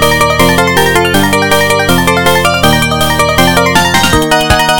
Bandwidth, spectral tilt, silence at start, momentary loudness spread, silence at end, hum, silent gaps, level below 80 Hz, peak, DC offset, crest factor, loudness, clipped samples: 20 kHz; -3.5 dB/octave; 0 s; 1 LU; 0 s; none; none; -26 dBFS; 0 dBFS; 5%; 8 dB; -8 LUFS; 1%